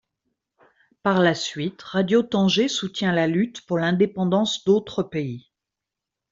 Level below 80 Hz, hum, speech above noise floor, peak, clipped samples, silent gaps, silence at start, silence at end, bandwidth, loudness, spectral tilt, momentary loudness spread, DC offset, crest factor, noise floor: -62 dBFS; none; 64 dB; -4 dBFS; under 0.1%; none; 1.05 s; 0.95 s; 7.8 kHz; -22 LUFS; -5.5 dB/octave; 8 LU; under 0.1%; 18 dB; -86 dBFS